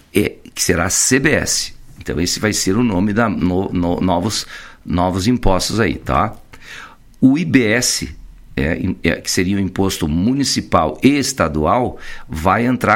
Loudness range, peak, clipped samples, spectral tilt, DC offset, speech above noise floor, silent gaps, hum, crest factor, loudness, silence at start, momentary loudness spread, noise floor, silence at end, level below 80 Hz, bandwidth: 2 LU; 0 dBFS; under 0.1%; -4 dB/octave; under 0.1%; 21 dB; none; none; 16 dB; -16 LUFS; 0.15 s; 11 LU; -37 dBFS; 0 s; -32 dBFS; 16.5 kHz